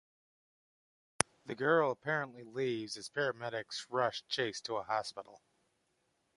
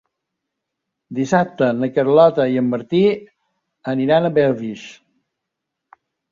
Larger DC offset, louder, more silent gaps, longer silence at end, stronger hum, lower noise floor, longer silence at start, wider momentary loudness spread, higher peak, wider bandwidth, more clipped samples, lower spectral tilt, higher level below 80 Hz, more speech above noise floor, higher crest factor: neither; second, -36 LUFS vs -17 LUFS; neither; second, 1 s vs 1.4 s; neither; about the same, -79 dBFS vs -80 dBFS; first, 1.45 s vs 1.1 s; second, 10 LU vs 16 LU; about the same, -4 dBFS vs -2 dBFS; first, 11.5 kHz vs 7.6 kHz; neither; second, -3 dB/octave vs -7 dB/octave; second, -74 dBFS vs -62 dBFS; second, 43 dB vs 63 dB; first, 34 dB vs 18 dB